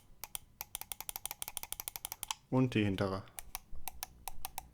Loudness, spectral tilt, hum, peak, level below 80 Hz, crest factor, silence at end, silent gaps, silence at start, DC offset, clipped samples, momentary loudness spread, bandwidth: -39 LUFS; -4.5 dB/octave; none; -18 dBFS; -56 dBFS; 22 dB; 0.05 s; none; 0.1 s; under 0.1%; under 0.1%; 13 LU; over 20 kHz